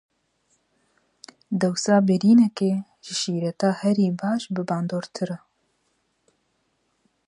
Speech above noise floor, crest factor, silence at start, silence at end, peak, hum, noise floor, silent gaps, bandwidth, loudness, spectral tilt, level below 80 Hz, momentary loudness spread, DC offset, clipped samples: 49 dB; 18 dB; 1.5 s; 1.9 s; -6 dBFS; none; -71 dBFS; none; 11 kHz; -23 LUFS; -6 dB/octave; -70 dBFS; 13 LU; under 0.1%; under 0.1%